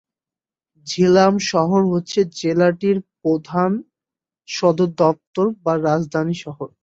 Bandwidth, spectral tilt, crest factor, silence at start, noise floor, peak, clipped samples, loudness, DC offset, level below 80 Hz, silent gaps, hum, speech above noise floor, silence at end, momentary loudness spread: 8 kHz; -6 dB/octave; 18 dB; 0.85 s; under -90 dBFS; -2 dBFS; under 0.1%; -19 LUFS; under 0.1%; -60 dBFS; 5.27-5.33 s; none; over 72 dB; 0.15 s; 11 LU